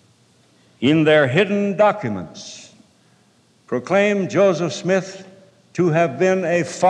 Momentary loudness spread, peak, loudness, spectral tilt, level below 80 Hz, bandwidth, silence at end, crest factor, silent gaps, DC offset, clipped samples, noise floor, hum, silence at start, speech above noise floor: 19 LU; -2 dBFS; -18 LUFS; -6 dB/octave; -74 dBFS; 10 kHz; 0 s; 18 dB; none; under 0.1%; under 0.1%; -57 dBFS; none; 0.8 s; 39 dB